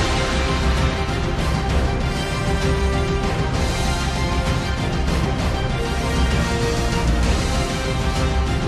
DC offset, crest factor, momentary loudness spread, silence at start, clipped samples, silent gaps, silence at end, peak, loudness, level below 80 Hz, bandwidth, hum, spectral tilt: under 0.1%; 12 dB; 3 LU; 0 s; under 0.1%; none; 0 s; -8 dBFS; -21 LUFS; -24 dBFS; 13.5 kHz; none; -5 dB/octave